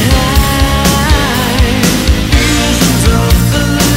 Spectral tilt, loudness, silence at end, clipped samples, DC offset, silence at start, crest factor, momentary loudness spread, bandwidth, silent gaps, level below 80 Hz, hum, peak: -4.5 dB/octave; -10 LUFS; 0 s; 0.2%; under 0.1%; 0 s; 10 dB; 2 LU; 16.5 kHz; none; -14 dBFS; none; 0 dBFS